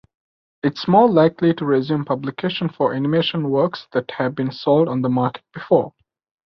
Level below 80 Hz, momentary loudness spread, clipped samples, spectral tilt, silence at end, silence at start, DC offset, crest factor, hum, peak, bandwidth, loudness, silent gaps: -60 dBFS; 10 LU; under 0.1%; -8.5 dB/octave; 0.6 s; 0.65 s; under 0.1%; 18 dB; none; -2 dBFS; 6.2 kHz; -19 LUFS; none